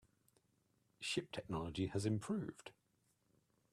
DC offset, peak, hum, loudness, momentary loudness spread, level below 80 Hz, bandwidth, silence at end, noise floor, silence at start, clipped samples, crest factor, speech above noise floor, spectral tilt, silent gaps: under 0.1%; -26 dBFS; none; -43 LUFS; 11 LU; -70 dBFS; 13.5 kHz; 1 s; -80 dBFS; 1 s; under 0.1%; 20 dB; 38 dB; -5.5 dB/octave; none